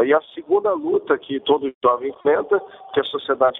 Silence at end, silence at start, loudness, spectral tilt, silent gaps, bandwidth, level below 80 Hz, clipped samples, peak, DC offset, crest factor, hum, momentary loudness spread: 0 s; 0 s; -21 LUFS; -8 dB/octave; 1.75-1.81 s; 4 kHz; -64 dBFS; under 0.1%; -4 dBFS; under 0.1%; 16 dB; none; 4 LU